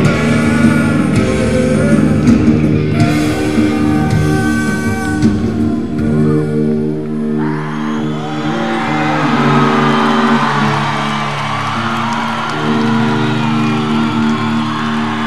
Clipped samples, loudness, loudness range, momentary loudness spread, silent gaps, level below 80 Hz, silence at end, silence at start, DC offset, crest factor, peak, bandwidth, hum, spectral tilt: under 0.1%; -13 LUFS; 4 LU; 6 LU; none; -32 dBFS; 0 s; 0 s; 3%; 14 dB; 0 dBFS; 13 kHz; none; -6.5 dB/octave